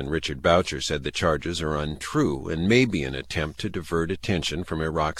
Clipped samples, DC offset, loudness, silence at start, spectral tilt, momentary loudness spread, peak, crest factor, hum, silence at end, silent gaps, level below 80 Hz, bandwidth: under 0.1%; under 0.1%; -25 LUFS; 0 s; -5 dB/octave; 8 LU; -6 dBFS; 20 dB; none; 0 s; none; -42 dBFS; 14 kHz